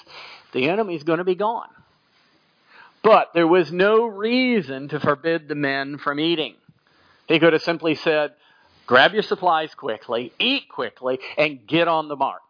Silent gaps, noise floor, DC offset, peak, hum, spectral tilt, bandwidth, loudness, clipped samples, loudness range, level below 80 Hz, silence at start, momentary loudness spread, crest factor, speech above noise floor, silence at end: none; -61 dBFS; under 0.1%; -2 dBFS; none; -6.5 dB/octave; 5.2 kHz; -21 LUFS; under 0.1%; 3 LU; -70 dBFS; 0.1 s; 12 LU; 20 dB; 40 dB; 0.1 s